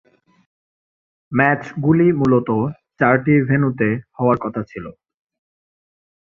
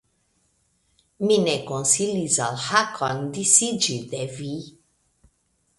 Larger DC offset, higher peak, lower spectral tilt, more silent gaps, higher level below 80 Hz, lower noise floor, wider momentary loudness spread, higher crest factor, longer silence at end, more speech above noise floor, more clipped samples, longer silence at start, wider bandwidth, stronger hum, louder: neither; about the same, -2 dBFS vs 0 dBFS; first, -10 dB/octave vs -2.5 dB/octave; neither; first, -54 dBFS vs -64 dBFS; first, under -90 dBFS vs -69 dBFS; about the same, 12 LU vs 14 LU; second, 18 dB vs 24 dB; first, 1.3 s vs 1.1 s; first, over 73 dB vs 46 dB; neither; about the same, 1.3 s vs 1.2 s; second, 7 kHz vs 11.5 kHz; neither; first, -18 LUFS vs -21 LUFS